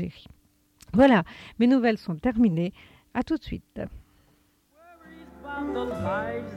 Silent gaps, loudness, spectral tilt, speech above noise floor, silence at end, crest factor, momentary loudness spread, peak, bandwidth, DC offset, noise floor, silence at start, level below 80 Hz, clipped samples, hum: none; -25 LUFS; -7.5 dB/octave; 39 dB; 0 s; 20 dB; 19 LU; -8 dBFS; 9.4 kHz; under 0.1%; -64 dBFS; 0 s; -50 dBFS; under 0.1%; none